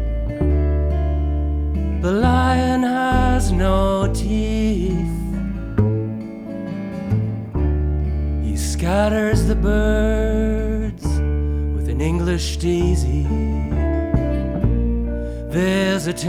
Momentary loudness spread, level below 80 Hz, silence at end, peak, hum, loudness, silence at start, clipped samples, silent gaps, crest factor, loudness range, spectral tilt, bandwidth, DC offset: 7 LU; -22 dBFS; 0 s; -2 dBFS; none; -20 LUFS; 0 s; under 0.1%; none; 16 dB; 4 LU; -6.5 dB/octave; 14.5 kHz; under 0.1%